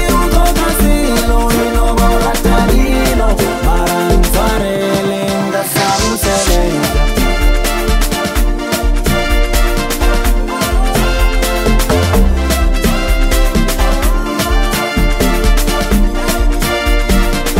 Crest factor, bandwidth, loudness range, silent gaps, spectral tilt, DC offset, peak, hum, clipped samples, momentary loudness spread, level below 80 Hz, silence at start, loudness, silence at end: 10 dB; 16.5 kHz; 2 LU; none; -4.5 dB/octave; under 0.1%; 0 dBFS; none; under 0.1%; 3 LU; -14 dBFS; 0 s; -13 LUFS; 0 s